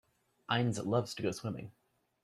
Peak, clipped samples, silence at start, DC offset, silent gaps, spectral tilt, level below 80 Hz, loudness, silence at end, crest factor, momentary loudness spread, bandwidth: -16 dBFS; under 0.1%; 0.5 s; under 0.1%; none; -5.5 dB/octave; -70 dBFS; -35 LUFS; 0.5 s; 20 dB; 17 LU; 13.5 kHz